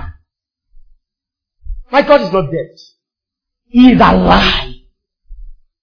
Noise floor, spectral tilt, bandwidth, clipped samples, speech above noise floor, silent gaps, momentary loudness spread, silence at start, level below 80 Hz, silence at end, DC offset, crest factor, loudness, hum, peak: -82 dBFS; -7 dB/octave; 5.4 kHz; 0.4%; 73 dB; none; 16 LU; 0 s; -28 dBFS; 0.3 s; under 0.1%; 14 dB; -10 LUFS; none; 0 dBFS